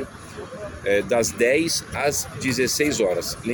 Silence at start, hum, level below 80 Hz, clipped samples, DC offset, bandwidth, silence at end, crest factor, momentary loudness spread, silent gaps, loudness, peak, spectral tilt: 0 s; none; -48 dBFS; under 0.1%; under 0.1%; 19 kHz; 0 s; 16 dB; 16 LU; none; -22 LUFS; -6 dBFS; -3 dB/octave